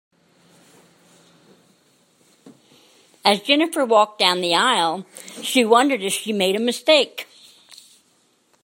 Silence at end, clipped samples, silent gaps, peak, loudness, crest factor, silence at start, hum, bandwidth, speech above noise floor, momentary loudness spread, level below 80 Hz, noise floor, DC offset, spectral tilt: 1.4 s; under 0.1%; none; 0 dBFS; -18 LUFS; 22 dB; 2.45 s; none; 16.5 kHz; 43 dB; 13 LU; -76 dBFS; -62 dBFS; under 0.1%; -2.5 dB/octave